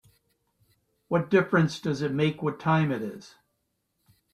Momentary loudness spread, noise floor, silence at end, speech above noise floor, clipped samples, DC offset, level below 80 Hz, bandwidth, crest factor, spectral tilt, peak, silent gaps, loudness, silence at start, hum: 9 LU; -77 dBFS; 1.05 s; 52 dB; under 0.1%; under 0.1%; -66 dBFS; 10 kHz; 20 dB; -7 dB/octave; -8 dBFS; none; -26 LUFS; 1.1 s; none